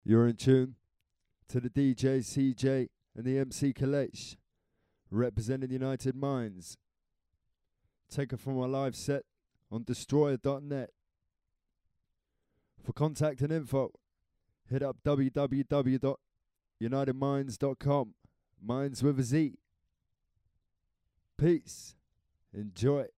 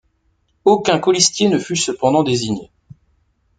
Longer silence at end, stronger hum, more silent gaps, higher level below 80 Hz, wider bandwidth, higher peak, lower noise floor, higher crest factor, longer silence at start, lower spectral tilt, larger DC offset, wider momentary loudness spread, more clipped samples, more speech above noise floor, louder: second, 0.1 s vs 0.95 s; neither; neither; second, -60 dBFS vs -54 dBFS; first, 14 kHz vs 9.4 kHz; second, -14 dBFS vs 0 dBFS; first, -84 dBFS vs -63 dBFS; about the same, 20 dB vs 18 dB; second, 0.1 s vs 0.65 s; first, -7 dB/octave vs -3.5 dB/octave; neither; first, 14 LU vs 7 LU; neither; first, 54 dB vs 47 dB; second, -32 LUFS vs -16 LUFS